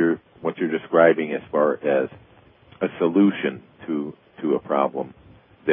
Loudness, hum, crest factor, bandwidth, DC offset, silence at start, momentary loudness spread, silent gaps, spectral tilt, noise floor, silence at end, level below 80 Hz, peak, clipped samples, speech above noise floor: -23 LUFS; none; 20 dB; 3.7 kHz; under 0.1%; 0 s; 13 LU; none; -11 dB/octave; -52 dBFS; 0 s; -64 dBFS; -2 dBFS; under 0.1%; 31 dB